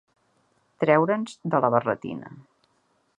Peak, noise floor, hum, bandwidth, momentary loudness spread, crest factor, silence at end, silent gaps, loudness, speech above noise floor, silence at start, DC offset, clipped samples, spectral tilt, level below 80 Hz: -4 dBFS; -68 dBFS; none; 10.5 kHz; 16 LU; 22 dB; 0.8 s; none; -24 LUFS; 45 dB; 0.8 s; under 0.1%; under 0.1%; -7.5 dB/octave; -70 dBFS